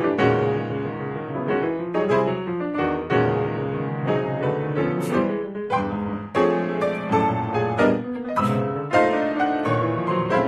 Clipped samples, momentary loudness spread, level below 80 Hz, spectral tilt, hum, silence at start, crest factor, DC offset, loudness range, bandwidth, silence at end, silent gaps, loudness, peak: under 0.1%; 6 LU; -54 dBFS; -7.5 dB/octave; none; 0 s; 18 dB; under 0.1%; 2 LU; 12.5 kHz; 0 s; none; -23 LUFS; -6 dBFS